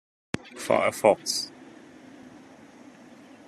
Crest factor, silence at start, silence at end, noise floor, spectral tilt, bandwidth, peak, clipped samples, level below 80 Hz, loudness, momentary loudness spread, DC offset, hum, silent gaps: 24 dB; 0.35 s; 1.2 s; -50 dBFS; -3 dB/octave; 14 kHz; -6 dBFS; under 0.1%; -66 dBFS; -26 LUFS; 27 LU; under 0.1%; none; none